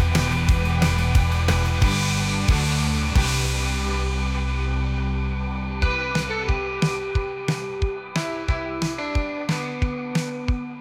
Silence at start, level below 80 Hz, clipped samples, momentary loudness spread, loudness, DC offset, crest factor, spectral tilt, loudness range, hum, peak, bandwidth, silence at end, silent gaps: 0 s; -26 dBFS; under 0.1%; 7 LU; -23 LUFS; under 0.1%; 16 dB; -5 dB/octave; 5 LU; none; -6 dBFS; 16 kHz; 0 s; none